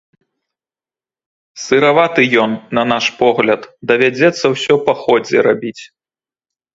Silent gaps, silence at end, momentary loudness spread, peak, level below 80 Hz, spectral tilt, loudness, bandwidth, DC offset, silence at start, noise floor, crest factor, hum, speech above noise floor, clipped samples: none; 0.9 s; 6 LU; 0 dBFS; -58 dBFS; -4.5 dB/octave; -13 LUFS; 7.8 kHz; under 0.1%; 1.55 s; under -90 dBFS; 16 dB; none; over 77 dB; under 0.1%